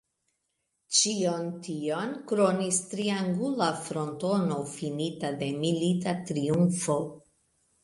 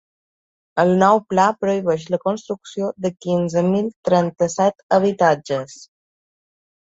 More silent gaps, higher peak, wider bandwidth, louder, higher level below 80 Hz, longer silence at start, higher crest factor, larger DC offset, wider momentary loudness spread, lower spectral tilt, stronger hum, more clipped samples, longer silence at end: second, none vs 3.96-4.03 s, 4.83-4.89 s; second, -10 dBFS vs -2 dBFS; first, 11.5 kHz vs 8 kHz; second, -28 LUFS vs -19 LUFS; second, -68 dBFS vs -62 dBFS; first, 0.9 s vs 0.75 s; about the same, 18 dB vs 18 dB; neither; second, 8 LU vs 11 LU; second, -4.5 dB/octave vs -6 dB/octave; neither; neither; second, 0.65 s vs 1 s